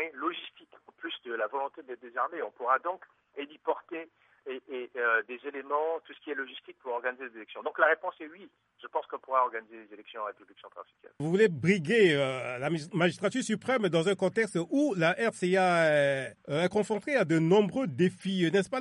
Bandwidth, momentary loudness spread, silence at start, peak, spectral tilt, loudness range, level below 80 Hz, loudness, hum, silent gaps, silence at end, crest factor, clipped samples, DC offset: 11.5 kHz; 18 LU; 0 s; -10 dBFS; -5.5 dB/octave; 8 LU; -76 dBFS; -29 LUFS; none; none; 0 s; 20 dB; under 0.1%; under 0.1%